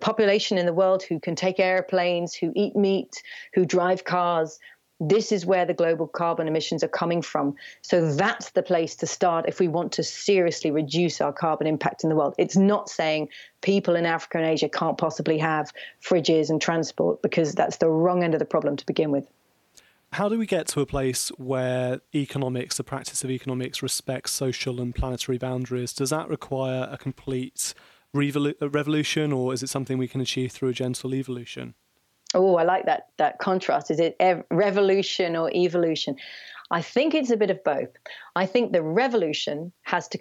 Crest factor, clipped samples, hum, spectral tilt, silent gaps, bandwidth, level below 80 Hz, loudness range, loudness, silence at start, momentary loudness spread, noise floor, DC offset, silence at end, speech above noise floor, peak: 20 dB; under 0.1%; none; -5 dB/octave; none; 14.5 kHz; -52 dBFS; 5 LU; -25 LUFS; 0 s; 8 LU; -59 dBFS; under 0.1%; 0 s; 34 dB; -6 dBFS